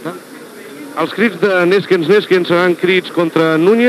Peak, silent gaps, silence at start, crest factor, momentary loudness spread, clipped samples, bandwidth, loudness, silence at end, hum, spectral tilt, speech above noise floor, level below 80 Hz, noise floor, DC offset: 0 dBFS; none; 0 s; 14 dB; 20 LU; under 0.1%; 14.5 kHz; -13 LUFS; 0 s; none; -6 dB/octave; 21 dB; -80 dBFS; -33 dBFS; under 0.1%